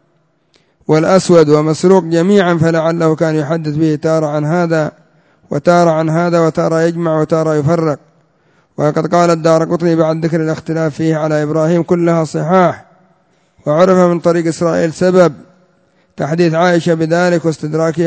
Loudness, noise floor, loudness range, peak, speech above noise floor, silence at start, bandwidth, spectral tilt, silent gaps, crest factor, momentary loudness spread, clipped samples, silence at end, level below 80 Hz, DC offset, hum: -12 LUFS; -58 dBFS; 3 LU; 0 dBFS; 46 dB; 0.9 s; 8 kHz; -7 dB/octave; none; 12 dB; 7 LU; 0.1%; 0 s; -52 dBFS; under 0.1%; none